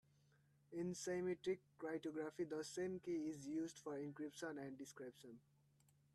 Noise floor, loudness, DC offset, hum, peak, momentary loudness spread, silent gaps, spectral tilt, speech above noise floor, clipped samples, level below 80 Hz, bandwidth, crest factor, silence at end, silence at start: -76 dBFS; -48 LUFS; under 0.1%; none; -34 dBFS; 11 LU; none; -5 dB/octave; 29 dB; under 0.1%; -86 dBFS; 13.5 kHz; 16 dB; 0.75 s; 0.7 s